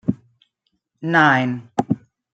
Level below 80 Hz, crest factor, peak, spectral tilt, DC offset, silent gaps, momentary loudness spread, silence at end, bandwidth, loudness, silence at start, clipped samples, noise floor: -60 dBFS; 18 dB; -2 dBFS; -6.5 dB/octave; under 0.1%; none; 15 LU; 0.35 s; 8.8 kHz; -19 LUFS; 0.05 s; under 0.1%; -73 dBFS